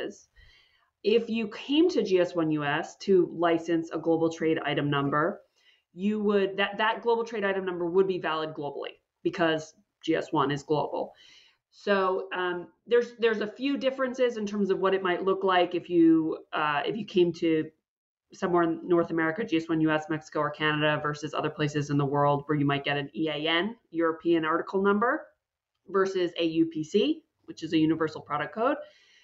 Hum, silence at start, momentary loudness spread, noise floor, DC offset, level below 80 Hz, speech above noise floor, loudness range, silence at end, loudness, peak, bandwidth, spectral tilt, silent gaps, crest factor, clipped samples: none; 0 s; 8 LU; -84 dBFS; under 0.1%; -68 dBFS; 57 dB; 3 LU; 0.4 s; -27 LUFS; -12 dBFS; 7.8 kHz; -6 dB/octave; 17.88-18.15 s; 16 dB; under 0.1%